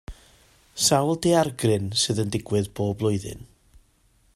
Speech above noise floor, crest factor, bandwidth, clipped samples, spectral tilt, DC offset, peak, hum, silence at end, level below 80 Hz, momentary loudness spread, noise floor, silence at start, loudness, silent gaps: 39 dB; 18 dB; 15.5 kHz; under 0.1%; -4.5 dB/octave; under 0.1%; -6 dBFS; none; 0.9 s; -52 dBFS; 11 LU; -62 dBFS; 0.1 s; -23 LUFS; none